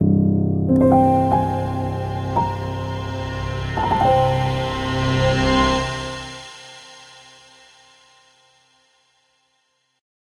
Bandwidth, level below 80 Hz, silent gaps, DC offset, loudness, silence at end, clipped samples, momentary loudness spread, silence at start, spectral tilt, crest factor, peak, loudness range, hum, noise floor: 11.5 kHz; -36 dBFS; none; under 0.1%; -20 LUFS; 3.35 s; under 0.1%; 18 LU; 0 s; -6.5 dB/octave; 18 dB; -2 dBFS; 10 LU; none; -67 dBFS